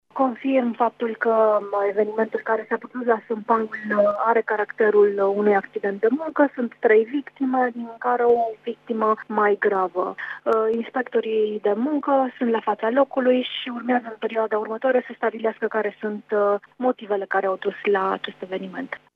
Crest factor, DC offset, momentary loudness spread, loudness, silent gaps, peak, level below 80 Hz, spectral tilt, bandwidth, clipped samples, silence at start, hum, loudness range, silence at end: 16 dB; under 0.1%; 8 LU; -22 LUFS; none; -6 dBFS; -76 dBFS; -7.5 dB/octave; 4.9 kHz; under 0.1%; 0.15 s; 50 Hz at -65 dBFS; 3 LU; 0.2 s